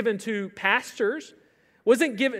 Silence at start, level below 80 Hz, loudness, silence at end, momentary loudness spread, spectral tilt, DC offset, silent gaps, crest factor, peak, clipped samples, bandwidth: 0 s; -78 dBFS; -25 LUFS; 0 s; 8 LU; -4 dB/octave; under 0.1%; none; 20 dB; -6 dBFS; under 0.1%; 15.5 kHz